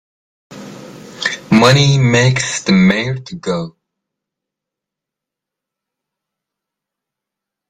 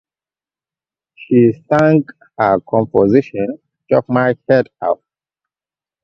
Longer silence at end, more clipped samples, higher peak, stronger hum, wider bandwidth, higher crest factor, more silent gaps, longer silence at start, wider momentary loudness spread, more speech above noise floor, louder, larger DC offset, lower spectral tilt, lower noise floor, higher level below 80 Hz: first, 4 s vs 1.1 s; neither; about the same, 0 dBFS vs 0 dBFS; neither; first, 12 kHz vs 7.2 kHz; about the same, 18 dB vs 16 dB; neither; second, 0.5 s vs 1.2 s; first, 24 LU vs 10 LU; second, 71 dB vs over 76 dB; about the same, -13 LUFS vs -15 LUFS; neither; second, -5 dB/octave vs -9.5 dB/octave; second, -84 dBFS vs under -90 dBFS; about the same, -50 dBFS vs -54 dBFS